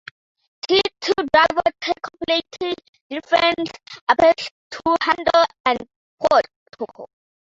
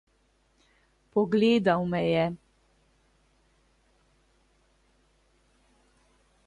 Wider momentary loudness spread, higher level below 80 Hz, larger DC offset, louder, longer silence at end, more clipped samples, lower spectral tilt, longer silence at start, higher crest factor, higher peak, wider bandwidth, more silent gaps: first, 16 LU vs 9 LU; first, -54 dBFS vs -64 dBFS; neither; first, -19 LUFS vs -26 LUFS; second, 0.5 s vs 4.1 s; neither; second, -3.5 dB/octave vs -7.5 dB/octave; second, 0.65 s vs 1.15 s; about the same, 18 dB vs 20 dB; first, -2 dBFS vs -12 dBFS; second, 7.8 kHz vs 10.5 kHz; first, 2.89-2.93 s, 3.01-3.10 s, 4.01-4.07 s, 4.51-4.70 s, 5.60-5.64 s, 5.96-6.18 s, 6.56-6.66 s vs none